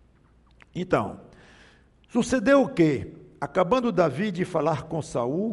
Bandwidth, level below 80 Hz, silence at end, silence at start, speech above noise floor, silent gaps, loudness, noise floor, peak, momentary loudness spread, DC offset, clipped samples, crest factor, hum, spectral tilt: 11.5 kHz; -54 dBFS; 0 s; 0.75 s; 34 dB; none; -25 LUFS; -58 dBFS; -6 dBFS; 15 LU; under 0.1%; under 0.1%; 20 dB; none; -6.5 dB/octave